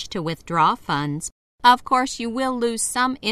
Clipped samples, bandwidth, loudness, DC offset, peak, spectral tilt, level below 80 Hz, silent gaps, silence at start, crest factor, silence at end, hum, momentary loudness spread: under 0.1%; 14 kHz; -21 LUFS; under 0.1%; -2 dBFS; -3.5 dB/octave; -52 dBFS; 1.32-1.58 s; 0 s; 20 dB; 0 s; none; 11 LU